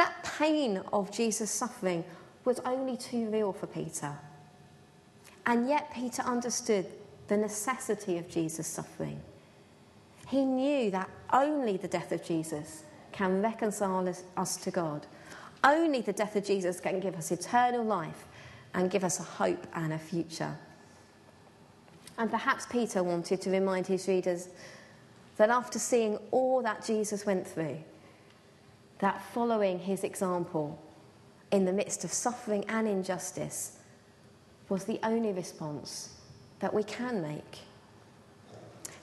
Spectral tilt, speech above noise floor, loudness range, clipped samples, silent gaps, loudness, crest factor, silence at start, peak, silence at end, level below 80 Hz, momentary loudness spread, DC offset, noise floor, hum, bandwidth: -4.5 dB/octave; 27 dB; 5 LU; under 0.1%; none; -32 LUFS; 24 dB; 0 s; -8 dBFS; 0 s; -72 dBFS; 15 LU; under 0.1%; -58 dBFS; none; 12.5 kHz